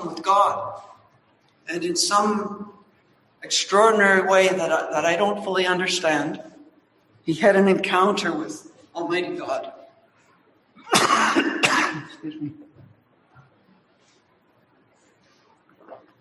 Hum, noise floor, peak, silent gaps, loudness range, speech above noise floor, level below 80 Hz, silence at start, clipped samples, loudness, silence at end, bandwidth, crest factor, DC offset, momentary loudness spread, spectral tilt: none; -61 dBFS; -2 dBFS; none; 6 LU; 40 dB; -68 dBFS; 0 s; under 0.1%; -20 LUFS; 0.25 s; 12.5 kHz; 22 dB; under 0.1%; 19 LU; -3 dB/octave